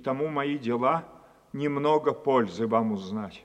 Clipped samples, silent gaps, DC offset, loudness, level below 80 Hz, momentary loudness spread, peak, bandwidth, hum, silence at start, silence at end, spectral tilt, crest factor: under 0.1%; none; under 0.1%; -27 LUFS; -68 dBFS; 8 LU; -10 dBFS; 8.8 kHz; none; 0 s; 0.05 s; -7.5 dB/octave; 18 dB